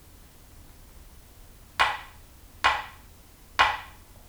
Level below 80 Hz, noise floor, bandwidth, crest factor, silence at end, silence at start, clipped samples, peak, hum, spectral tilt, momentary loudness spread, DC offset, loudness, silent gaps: -50 dBFS; -51 dBFS; over 20 kHz; 26 dB; 0.4 s; 0.55 s; under 0.1%; -4 dBFS; none; -1.5 dB/octave; 20 LU; under 0.1%; -26 LUFS; none